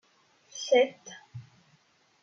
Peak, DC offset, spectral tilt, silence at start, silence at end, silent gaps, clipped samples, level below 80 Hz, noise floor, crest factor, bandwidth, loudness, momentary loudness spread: -12 dBFS; under 0.1%; -3 dB/octave; 0.55 s; 0.8 s; none; under 0.1%; -82 dBFS; -66 dBFS; 20 dB; 7.6 kHz; -27 LUFS; 24 LU